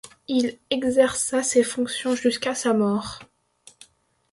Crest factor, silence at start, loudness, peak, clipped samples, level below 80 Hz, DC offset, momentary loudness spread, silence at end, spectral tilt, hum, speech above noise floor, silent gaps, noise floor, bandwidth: 18 dB; 0.05 s; -23 LUFS; -6 dBFS; under 0.1%; -60 dBFS; under 0.1%; 6 LU; 1.1 s; -3.5 dB/octave; none; 38 dB; none; -60 dBFS; 11.5 kHz